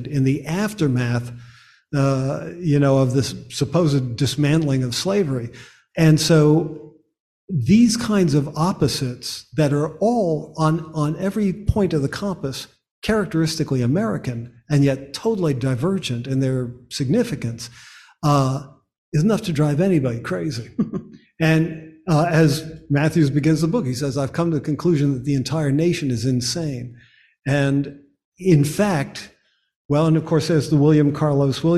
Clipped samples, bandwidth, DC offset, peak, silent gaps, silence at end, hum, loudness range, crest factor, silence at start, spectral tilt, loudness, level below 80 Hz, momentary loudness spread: under 0.1%; 14 kHz; under 0.1%; -4 dBFS; 7.20-7.48 s, 12.91-13.02 s, 18.98-19.12 s, 28.25-28.32 s, 29.76-29.89 s; 0 s; none; 4 LU; 16 dB; 0 s; -6.5 dB/octave; -20 LUFS; -44 dBFS; 11 LU